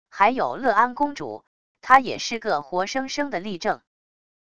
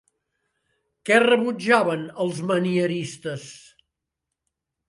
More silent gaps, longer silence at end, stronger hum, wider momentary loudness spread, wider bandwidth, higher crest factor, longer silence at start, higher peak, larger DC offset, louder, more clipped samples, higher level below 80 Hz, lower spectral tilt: first, 1.47-1.75 s vs none; second, 0.7 s vs 1.3 s; neither; about the same, 16 LU vs 16 LU; about the same, 11 kHz vs 11.5 kHz; about the same, 24 dB vs 20 dB; second, 0.05 s vs 1.05 s; first, 0 dBFS vs -4 dBFS; first, 0.5% vs under 0.1%; about the same, -22 LUFS vs -21 LUFS; neither; first, -60 dBFS vs -72 dBFS; second, -3.5 dB/octave vs -5 dB/octave